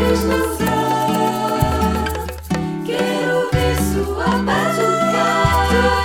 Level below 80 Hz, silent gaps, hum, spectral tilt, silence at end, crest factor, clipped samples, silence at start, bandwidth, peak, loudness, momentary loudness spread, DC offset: -28 dBFS; none; none; -5.5 dB/octave; 0 s; 16 dB; under 0.1%; 0 s; 19 kHz; -2 dBFS; -18 LUFS; 7 LU; under 0.1%